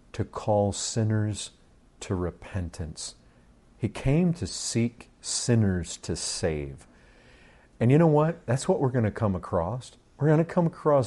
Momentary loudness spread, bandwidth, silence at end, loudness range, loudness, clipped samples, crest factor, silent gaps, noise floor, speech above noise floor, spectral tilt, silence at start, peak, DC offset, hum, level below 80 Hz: 13 LU; 11.5 kHz; 0 s; 6 LU; -27 LUFS; under 0.1%; 18 dB; none; -57 dBFS; 31 dB; -6 dB/octave; 0.15 s; -8 dBFS; under 0.1%; none; -50 dBFS